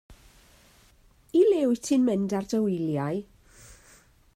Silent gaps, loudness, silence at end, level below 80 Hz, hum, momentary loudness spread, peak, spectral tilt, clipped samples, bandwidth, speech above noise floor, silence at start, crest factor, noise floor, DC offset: none; -25 LUFS; 0.65 s; -60 dBFS; none; 8 LU; -12 dBFS; -6.5 dB/octave; under 0.1%; 16 kHz; 33 dB; 0.1 s; 16 dB; -59 dBFS; under 0.1%